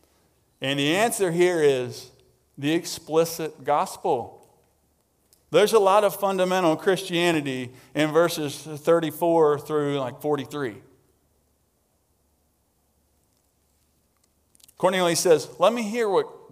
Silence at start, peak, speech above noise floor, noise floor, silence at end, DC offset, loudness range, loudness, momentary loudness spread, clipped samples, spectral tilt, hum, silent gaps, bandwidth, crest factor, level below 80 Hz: 0.6 s; -6 dBFS; 46 dB; -68 dBFS; 0.15 s; under 0.1%; 9 LU; -23 LUFS; 11 LU; under 0.1%; -4.5 dB/octave; none; none; 16 kHz; 20 dB; -70 dBFS